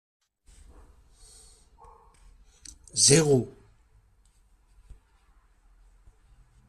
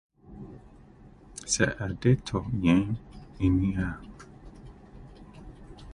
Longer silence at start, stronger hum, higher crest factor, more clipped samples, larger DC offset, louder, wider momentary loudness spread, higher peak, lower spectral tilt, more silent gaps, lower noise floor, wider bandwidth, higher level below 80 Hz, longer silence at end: first, 2.95 s vs 0.3 s; neither; about the same, 26 dB vs 22 dB; neither; neither; first, -21 LUFS vs -27 LUFS; first, 30 LU vs 25 LU; first, -4 dBFS vs -8 dBFS; second, -3.5 dB/octave vs -5.5 dB/octave; neither; first, -62 dBFS vs -52 dBFS; first, 13.5 kHz vs 11.5 kHz; second, -56 dBFS vs -44 dBFS; first, 3.2 s vs 0 s